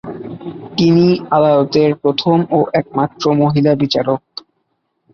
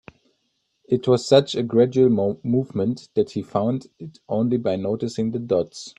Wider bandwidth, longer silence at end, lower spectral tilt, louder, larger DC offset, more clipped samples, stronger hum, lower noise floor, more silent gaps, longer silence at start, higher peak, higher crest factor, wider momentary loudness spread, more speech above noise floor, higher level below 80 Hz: second, 6.8 kHz vs 9.6 kHz; first, 0.95 s vs 0.1 s; about the same, -7.5 dB/octave vs -7 dB/octave; first, -14 LUFS vs -22 LUFS; neither; neither; neither; second, -68 dBFS vs -72 dBFS; neither; second, 0.05 s vs 0.9 s; about the same, -2 dBFS vs -2 dBFS; second, 14 dB vs 20 dB; first, 16 LU vs 9 LU; about the same, 54 dB vs 51 dB; first, -54 dBFS vs -62 dBFS